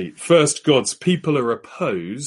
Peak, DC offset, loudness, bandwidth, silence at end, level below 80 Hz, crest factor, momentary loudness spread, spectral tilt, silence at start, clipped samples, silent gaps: -2 dBFS; under 0.1%; -19 LUFS; 11.5 kHz; 0 s; -62 dBFS; 16 dB; 9 LU; -4.5 dB/octave; 0 s; under 0.1%; none